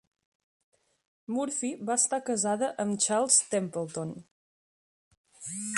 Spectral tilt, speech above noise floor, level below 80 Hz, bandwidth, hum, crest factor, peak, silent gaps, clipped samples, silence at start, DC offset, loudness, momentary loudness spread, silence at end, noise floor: -3 dB/octave; over 61 dB; -78 dBFS; 11.5 kHz; none; 24 dB; -8 dBFS; 4.31-5.11 s, 5.17-5.24 s; under 0.1%; 1.3 s; under 0.1%; -28 LUFS; 15 LU; 0 s; under -90 dBFS